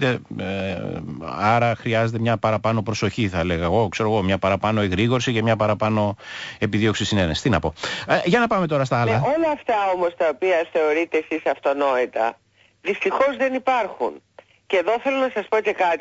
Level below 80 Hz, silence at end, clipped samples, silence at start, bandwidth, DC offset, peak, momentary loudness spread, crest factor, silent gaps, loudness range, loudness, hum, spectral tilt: -48 dBFS; 0 s; under 0.1%; 0 s; 8 kHz; under 0.1%; -6 dBFS; 7 LU; 14 dB; none; 2 LU; -21 LUFS; none; -6 dB/octave